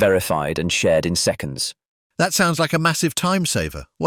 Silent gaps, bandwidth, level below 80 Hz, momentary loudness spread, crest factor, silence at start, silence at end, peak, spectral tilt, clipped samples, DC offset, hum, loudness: 1.86-2.10 s; 19 kHz; -46 dBFS; 8 LU; 16 dB; 0 s; 0 s; -4 dBFS; -4 dB/octave; under 0.1%; under 0.1%; none; -20 LUFS